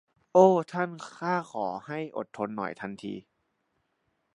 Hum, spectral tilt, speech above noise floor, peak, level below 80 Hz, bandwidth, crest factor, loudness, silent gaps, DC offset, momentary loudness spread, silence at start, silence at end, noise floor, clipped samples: none; -7 dB/octave; 49 dB; -6 dBFS; -76 dBFS; 10.5 kHz; 24 dB; -28 LUFS; none; under 0.1%; 17 LU; 0.35 s; 1.15 s; -76 dBFS; under 0.1%